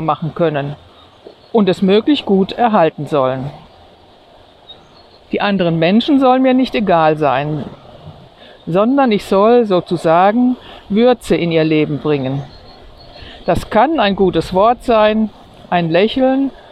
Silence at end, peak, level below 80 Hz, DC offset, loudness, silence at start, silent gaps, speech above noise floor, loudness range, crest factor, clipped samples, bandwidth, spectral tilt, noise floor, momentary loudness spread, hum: 0.15 s; 0 dBFS; -42 dBFS; under 0.1%; -14 LUFS; 0 s; none; 31 dB; 4 LU; 14 dB; under 0.1%; 13 kHz; -7 dB/octave; -44 dBFS; 11 LU; none